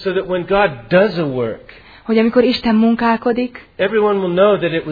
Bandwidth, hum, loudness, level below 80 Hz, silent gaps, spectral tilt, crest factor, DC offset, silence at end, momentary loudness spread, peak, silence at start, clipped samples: 5 kHz; none; -16 LUFS; -46 dBFS; none; -8.5 dB/octave; 16 dB; under 0.1%; 0 s; 8 LU; 0 dBFS; 0 s; under 0.1%